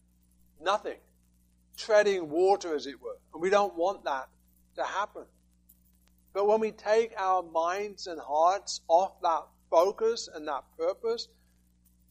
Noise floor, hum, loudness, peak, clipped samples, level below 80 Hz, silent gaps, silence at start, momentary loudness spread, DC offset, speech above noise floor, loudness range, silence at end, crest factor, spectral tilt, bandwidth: -65 dBFS; 60 Hz at -65 dBFS; -29 LUFS; -10 dBFS; under 0.1%; -66 dBFS; none; 0.6 s; 15 LU; under 0.1%; 37 dB; 5 LU; 0.85 s; 20 dB; -3 dB/octave; 15.5 kHz